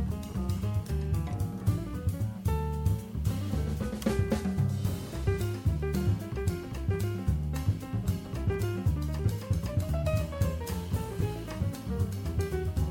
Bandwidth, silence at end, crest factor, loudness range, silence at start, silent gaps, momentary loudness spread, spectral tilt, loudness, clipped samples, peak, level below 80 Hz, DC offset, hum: 17 kHz; 0 s; 16 dB; 1 LU; 0 s; none; 4 LU; -7 dB/octave; -32 LUFS; under 0.1%; -14 dBFS; -38 dBFS; under 0.1%; none